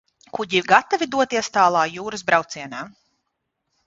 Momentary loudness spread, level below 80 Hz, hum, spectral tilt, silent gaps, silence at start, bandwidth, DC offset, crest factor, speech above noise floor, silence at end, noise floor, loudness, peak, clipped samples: 16 LU; -64 dBFS; none; -3 dB/octave; none; 0.35 s; 7.8 kHz; under 0.1%; 22 dB; 56 dB; 1 s; -77 dBFS; -20 LUFS; 0 dBFS; under 0.1%